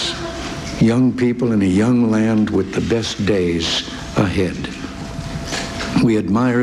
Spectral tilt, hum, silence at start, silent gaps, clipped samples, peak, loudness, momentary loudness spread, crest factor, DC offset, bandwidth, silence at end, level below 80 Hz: -5.5 dB/octave; none; 0 s; none; under 0.1%; -4 dBFS; -18 LUFS; 12 LU; 14 dB; under 0.1%; 12.5 kHz; 0 s; -38 dBFS